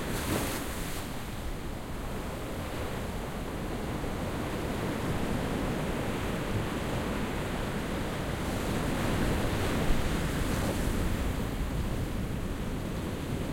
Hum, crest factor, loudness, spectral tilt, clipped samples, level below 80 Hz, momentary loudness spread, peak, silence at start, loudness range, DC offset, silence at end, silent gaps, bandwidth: none; 16 dB; -33 LUFS; -5.5 dB/octave; under 0.1%; -38 dBFS; 7 LU; -14 dBFS; 0 s; 5 LU; under 0.1%; 0 s; none; 16.5 kHz